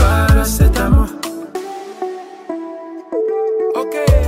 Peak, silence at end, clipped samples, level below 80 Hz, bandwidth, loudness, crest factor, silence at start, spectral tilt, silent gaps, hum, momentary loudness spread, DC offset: 0 dBFS; 0 s; under 0.1%; -18 dBFS; 16 kHz; -17 LUFS; 14 dB; 0 s; -6 dB/octave; none; none; 16 LU; under 0.1%